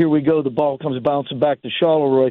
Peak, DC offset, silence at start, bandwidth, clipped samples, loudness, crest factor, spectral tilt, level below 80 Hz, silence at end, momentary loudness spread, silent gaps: -4 dBFS; under 0.1%; 0 s; 4.2 kHz; under 0.1%; -18 LUFS; 12 dB; -9.5 dB/octave; -58 dBFS; 0 s; 5 LU; none